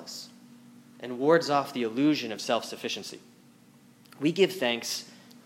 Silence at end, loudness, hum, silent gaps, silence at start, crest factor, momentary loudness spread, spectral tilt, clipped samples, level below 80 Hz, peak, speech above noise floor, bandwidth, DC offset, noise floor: 0.1 s; -28 LUFS; none; none; 0 s; 22 dB; 19 LU; -4 dB/octave; under 0.1%; -84 dBFS; -8 dBFS; 29 dB; 16.5 kHz; under 0.1%; -57 dBFS